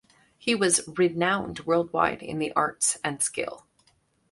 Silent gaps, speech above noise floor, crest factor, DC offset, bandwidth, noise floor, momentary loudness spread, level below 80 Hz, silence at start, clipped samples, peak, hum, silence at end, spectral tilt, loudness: none; 41 dB; 20 dB; under 0.1%; 11.5 kHz; -67 dBFS; 8 LU; -60 dBFS; 0.45 s; under 0.1%; -6 dBFS; none; 0.7 s; -3 dB/octave; -25 LUFS